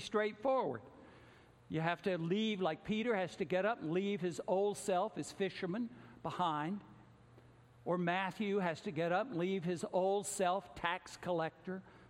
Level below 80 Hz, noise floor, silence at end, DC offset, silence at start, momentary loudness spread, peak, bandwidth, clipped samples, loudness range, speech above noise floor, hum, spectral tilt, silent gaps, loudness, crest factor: -72 dBFS; -62 dBFS; 0.05 s; under 0.1%; 0 s; 7 LU; -18 dBFS; 16 kHz; under 0.1%; 3 LU; 25 dB; none; -5 dB/octave; none; -38 LUFS; 20 dB